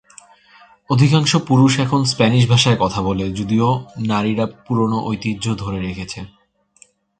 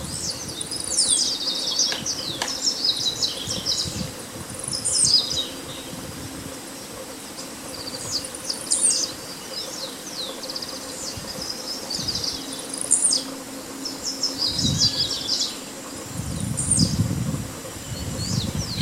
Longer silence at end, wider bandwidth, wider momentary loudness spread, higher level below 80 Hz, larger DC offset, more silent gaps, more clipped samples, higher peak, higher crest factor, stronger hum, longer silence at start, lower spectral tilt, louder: first, 0.95 s vs 0 s; second, 9.2 kHz vs 16 kHz; second, 11 LU vs 15 LU; about the same, -44 dBFS vs -48 dBFS; neither; neither; neither; first, 0 dBFS vs -4 dBFS; second, 18 dB vs 24 dB; neither; first, 0.9 s vs 0 s; first, -5.5 dB/octave vs -2 dB/octave; first, -17 LUFS vs -23 LUFS